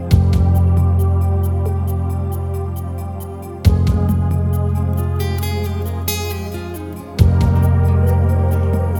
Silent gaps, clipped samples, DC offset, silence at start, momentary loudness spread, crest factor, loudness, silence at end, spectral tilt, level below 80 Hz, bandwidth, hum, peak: none; under 0.1%; under 0.1%; 0 s; 12 LU; 16 dB; -17 LUFS; 0 s; -7.5 dB/octave; -24 dBFS; 19 kHz; none; 0 dBFS